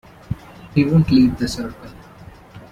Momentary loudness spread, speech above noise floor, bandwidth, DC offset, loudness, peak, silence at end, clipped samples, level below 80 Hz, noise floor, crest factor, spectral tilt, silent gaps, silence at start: 19 LU; 25 dB; 14.5 kHz; under 0.1%; -17 LUFS; -4 dBFS; 0.1 s; under 0.1%; -40 dBFS; -42 dBFS; 16 dB; -7 dB/octave; none; 0.3 s